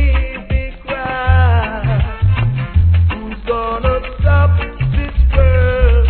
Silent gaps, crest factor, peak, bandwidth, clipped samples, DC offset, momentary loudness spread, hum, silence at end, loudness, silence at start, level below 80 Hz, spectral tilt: none; 12 dB; 0 dBFS; 4.3 kHz; under 0.1%; 0.3%; 8 LU; none; 0 s; -15 LUFS; 0 s; -16 dBFS; -11 dB/octave